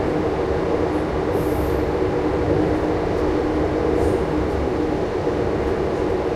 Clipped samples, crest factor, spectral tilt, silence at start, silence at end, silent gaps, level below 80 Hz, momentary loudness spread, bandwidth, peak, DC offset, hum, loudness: under 0.1%; 14 dB; -7.5 dB/octave; 0 s; 0 s; none; -32 dBFS; 2 LU; 14 kHz; -6 dBFS; under 0.1%; none; -21 LUFS